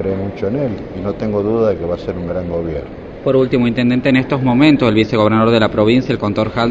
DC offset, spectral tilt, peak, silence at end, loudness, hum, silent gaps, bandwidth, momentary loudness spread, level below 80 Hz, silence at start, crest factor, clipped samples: under 0.1%; -8 dB/octave; 0 dBFS; 0 s; -15 LUFS; none; none; 7.8 kHz; 10 LU; -38 dBFS; 0 s; 14 dB; under 0.1%